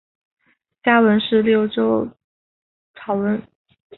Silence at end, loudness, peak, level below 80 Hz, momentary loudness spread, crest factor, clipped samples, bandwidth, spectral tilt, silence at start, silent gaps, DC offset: 0.55 s; -18 LUFS; -2 dBFS; -60 dBFS; 12 LU; 18 dB; under 0.1%; 4.2 kHz; -11 dB/octave; 0.85 s; 2.24-2.94 s; under 0.1%